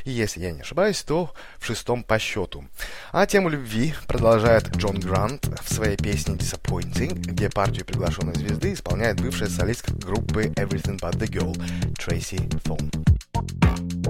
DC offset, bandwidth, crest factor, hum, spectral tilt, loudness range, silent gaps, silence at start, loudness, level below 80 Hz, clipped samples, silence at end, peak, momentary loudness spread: under 0.1%; 16.5 kHz; 18 dB; none; -5.5 dB/octave; 4 LU; none; 0 s; -24 LUFS; -34 dBFS; under 0.1%; 0 s; -6 dBFS; 8 LU